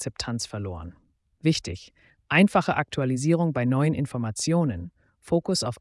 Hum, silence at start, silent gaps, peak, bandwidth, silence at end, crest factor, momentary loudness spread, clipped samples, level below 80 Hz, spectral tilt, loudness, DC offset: none; 0 s; none; -8 dBFS; 12 kHz; 0.05 s; 18 dB; 16 LU; under 0.1%; -54 dBFS; -5.5 dB/octave; -25 LUFS; under 0.1%